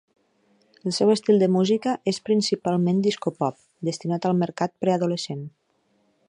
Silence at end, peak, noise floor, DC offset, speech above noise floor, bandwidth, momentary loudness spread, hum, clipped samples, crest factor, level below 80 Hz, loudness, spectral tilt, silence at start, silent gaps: 0.8 s; -6 dBFS; -67 dBFS; under 0.1%; 44 dB; 10.5 kHz; 11 LU; none; under 0.1%; 18 dB; -70 dBFS; -23 LUFS; -6 dB/octave; 0.85 s; none